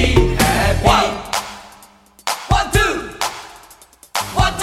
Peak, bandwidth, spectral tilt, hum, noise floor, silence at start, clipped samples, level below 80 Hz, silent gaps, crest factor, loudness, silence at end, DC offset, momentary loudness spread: 0 dBFS; 16.5 kHz; -4 dB/octave; none; -46 dBFS; 0 s; under 0.1%; -26 dBFS; none; 18 dB; -17 LUFS; 0 s; under 0.1%; 15 LU